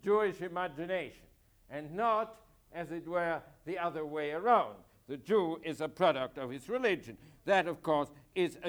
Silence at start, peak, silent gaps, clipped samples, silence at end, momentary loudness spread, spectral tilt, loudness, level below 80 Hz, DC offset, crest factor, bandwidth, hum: 0.05 s; -14 dBFS; none; under 0.1%; 0 s; 14 LU; -5.5 dB/octave; -34 LUFS; -68 dBFS; under 0.1%; 20 dB; over 20 kHz; none